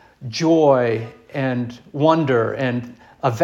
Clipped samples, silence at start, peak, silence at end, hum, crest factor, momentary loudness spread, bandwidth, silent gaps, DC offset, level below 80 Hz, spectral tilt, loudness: under 0.1%; 0.2 s; -2 dBFS; 0 s; none; 18 dB; 14 LU; 7.6 kHz; none; under 0.1%; -62 dBFS; -6.5 dB/octave; -19 LUFS